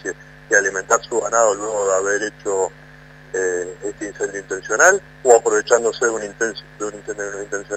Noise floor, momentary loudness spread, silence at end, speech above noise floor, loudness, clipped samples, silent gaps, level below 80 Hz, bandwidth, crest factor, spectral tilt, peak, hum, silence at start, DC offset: -43 dBFS; 15 LU; 0 s; 24 dB; -19 LUFS; under 0.1%; none; -54 dBFS; 15.5 kHz; 20 dB; -2 dB/octave; 0 dBFS; none; 0.05 s; under 0.1%